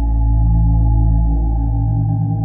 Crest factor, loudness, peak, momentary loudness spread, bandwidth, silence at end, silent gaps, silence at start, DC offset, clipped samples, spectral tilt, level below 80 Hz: 10 dB; -16 LUFS; -4 dBFS; 3 LU; 1 kHz; 0 s; none; 0 s; under 0.1%; under 0.1%; -15.5 dB/octave; -16 dBFS